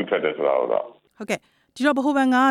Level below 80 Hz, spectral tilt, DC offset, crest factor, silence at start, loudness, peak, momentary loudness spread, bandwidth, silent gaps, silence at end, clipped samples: -70 dBFS; -4.5 dB/octave; under 0.1%; 16 dB; 0 s; -22 LUFS; -6 dBFS; 11 LU; 13 kHz; none; 0 s; under 0.1%